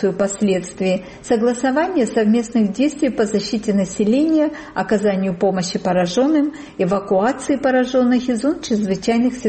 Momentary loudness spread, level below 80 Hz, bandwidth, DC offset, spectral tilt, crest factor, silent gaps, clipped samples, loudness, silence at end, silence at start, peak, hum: 5 LU; -50 dBFS; 8.8 kHz; under 0.1%; -5.5 dB/octave; 12 dB; none; under 0.1%; -18 LUFS; 0 s; 0 s; -6 dBFS; none